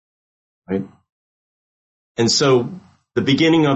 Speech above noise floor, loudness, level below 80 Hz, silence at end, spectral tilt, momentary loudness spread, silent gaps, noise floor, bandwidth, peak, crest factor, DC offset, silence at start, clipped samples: over 74 dB; -18 LUFS; -56 dBFS; 0 s; -4.5 dB/octave; 16 LU; 1.12-2.15 s; under -90 dBFS; 8.6 kHz; -4 dBFS; 16 dB; under 0.1%; 0.7 s; under 0.1%